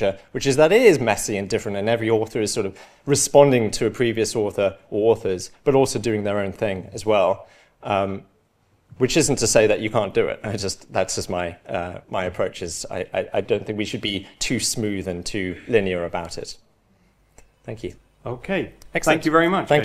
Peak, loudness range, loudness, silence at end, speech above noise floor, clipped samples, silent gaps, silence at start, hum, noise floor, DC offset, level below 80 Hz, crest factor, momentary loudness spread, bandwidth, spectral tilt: 0 dBFS; 7 LU; -21 LUFS; 0 s; 41 dB; under 0.1%; none; 0 s; none; -62 dBFS; under 0.1%; -48 dBFS; 22 dB; 13 LU; 15 kHz; -4 dB/octave